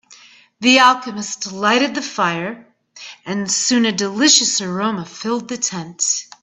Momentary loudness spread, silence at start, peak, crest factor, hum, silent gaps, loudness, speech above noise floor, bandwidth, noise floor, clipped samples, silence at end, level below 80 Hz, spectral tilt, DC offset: 14 LU; 0.1 s; 0 dBFS; 18 dB; none; none; -16 LUFS; 29 dB; 10.5 kHz; -46 dBFS; under 0.1%; 0.2 s; -64 dBFS; -2 dB/octave; under 0.1%